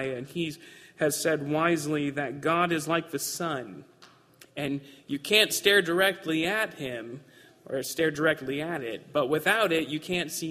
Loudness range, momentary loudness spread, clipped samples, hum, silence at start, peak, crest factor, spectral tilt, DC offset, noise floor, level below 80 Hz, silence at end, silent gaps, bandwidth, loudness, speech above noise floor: 4 LU; 14 LU; under 0.1%; none; 0 s; -6 dBFS; 22 dB; -3.5 dB/octave; under 0.1%; -57 dBFS; -66 dBFS; 0 s; none; 15.5 kHz; -27 LUFS; 29 dB